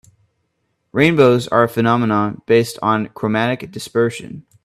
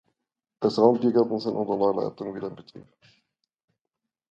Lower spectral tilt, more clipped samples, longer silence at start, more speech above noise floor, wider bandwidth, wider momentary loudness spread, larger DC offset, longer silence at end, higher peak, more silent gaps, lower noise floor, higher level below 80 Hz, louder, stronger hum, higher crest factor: second, -6.5 dB/octave vs -8 dB/octave; neither; first, 0.95 s vs 0.6 s; second, 53 dB vs 61 dB; first, 14.5 kHz vs 8 kHz; second, 11 LU vs 15 LU; neither; second, 0.25 s vs 1.5 s; first, 0 dBFS vs -4 dBFS; neither; second, -69 dBFS vs -85 dBFS; first, -54 dBFS vs -70 dBFS; first, -17 LUFS vs -24 LUFS; neither; about the same, 18 dB vs 22 dB